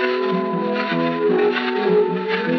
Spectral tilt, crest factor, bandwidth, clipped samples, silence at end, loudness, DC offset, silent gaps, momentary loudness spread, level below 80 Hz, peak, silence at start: -4 dB/octave; 14 dB; 6.2 kHz; under 0.1%; 0 s; -19 LUFS; under 0.1%; none; 4 LU; -80 dBFS; -6 dBFS; 0 s